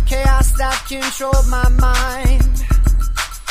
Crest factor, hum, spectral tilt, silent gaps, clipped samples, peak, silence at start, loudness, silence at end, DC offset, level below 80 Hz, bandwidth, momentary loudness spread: 12 dB; none; -4.5 dB/octave; none; under 0.1%; 0 dBFS; 0 s; -17 LUFS; 0 s; under 0.1%; -14 dBFS; 15.5 kHz; 5 LU